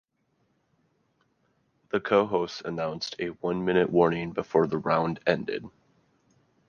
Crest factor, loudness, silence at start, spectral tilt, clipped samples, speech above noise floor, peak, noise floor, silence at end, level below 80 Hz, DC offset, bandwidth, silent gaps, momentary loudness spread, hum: 22 dB; -27 LUFS; 1.95 s; -6.5 dB/octave; under 0.1%; 46 dB; -6 dBFS; -73 dBFS; 1 s; -62 dBFS; under 0.1%; 7.2 kHz; none; 9 LU; none